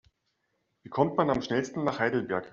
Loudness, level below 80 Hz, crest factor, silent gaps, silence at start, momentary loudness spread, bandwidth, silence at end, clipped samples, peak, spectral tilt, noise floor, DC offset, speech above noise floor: -29 LUFS; -62 dBFS; 20 dB; none; 0.85 s; 5 LU; 7.6 kHz; 0.05 s; under 0.1%; -10 dBFS; -5 dB/octave; -77 dBFS; under 0.1%; 49 dB